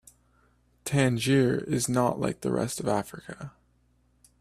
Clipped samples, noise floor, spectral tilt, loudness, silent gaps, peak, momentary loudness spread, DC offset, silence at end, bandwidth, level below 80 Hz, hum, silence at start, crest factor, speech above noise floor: under 0.1%; -66 dBFS; -5.5 dB/octave; -27 LUFS; none; -10 dBFS; 18 LU; under 0.1%; 0.9 s; 15 kHz; -58 dBFS; 60 Hz at -50 dBFS; 0.85 s; 18 dB; 40 dB